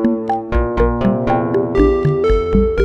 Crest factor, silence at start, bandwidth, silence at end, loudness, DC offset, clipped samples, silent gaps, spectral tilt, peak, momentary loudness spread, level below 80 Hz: 14 dB; 0 s; 7 kHz; 0 s; -16 LUFS; under 0.1%; under 0.1%; none; -9 dB/octave; 0 dBFS; 5 LU; -22 dBFS